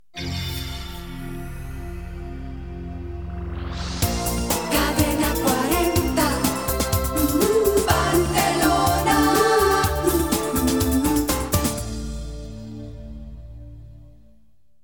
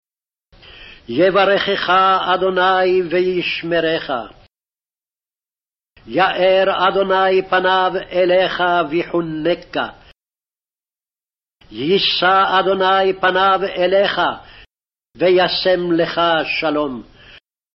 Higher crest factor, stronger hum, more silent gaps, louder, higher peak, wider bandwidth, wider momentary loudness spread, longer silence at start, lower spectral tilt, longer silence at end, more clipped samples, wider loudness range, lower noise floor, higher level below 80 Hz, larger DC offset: first, 20 dB vs 14 dB; neither; neither; second, -21 LUFS vs -16 LUFS; about the same, -2 dBFS vs -4 dBFS; first, 19.5 kHz vs 6 kHz; first, 17 LU vs 9 LU; second, 0.15 s vs 0.75 s; first, -4.5 dB/octave vs -2 dB/octave; about the same, 0.75 s vs 0.75 s; neither; first, 13 LU vs 6 LU; second, -62 dBFS vs under -90 dBFS; first, -32 dBFS vs -52 dBFS; first, 0.4% vs under 0.1%